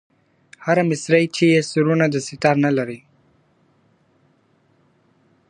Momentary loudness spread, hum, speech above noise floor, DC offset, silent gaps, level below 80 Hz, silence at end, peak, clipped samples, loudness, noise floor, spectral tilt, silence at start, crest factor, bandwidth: 10 LU; none; 43 dB; under 0.1%; none; -66 dBFS; 2.55 s; -2 dBFS; under 0.1%; -18 LUFS; -60 dBFS; -6 dB/octave; 0.6 s; 20 dB; 10.5 kHz